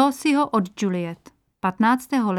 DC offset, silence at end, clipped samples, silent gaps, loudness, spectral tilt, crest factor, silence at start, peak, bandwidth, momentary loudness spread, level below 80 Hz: under 0.1%; 0 s; under 0.1%; none; -22 LUFS; -5.5 dB/octave; 14 dB; 0 s; -8 dBFS; 15.5 kHz; 10 LU; -64 dBFS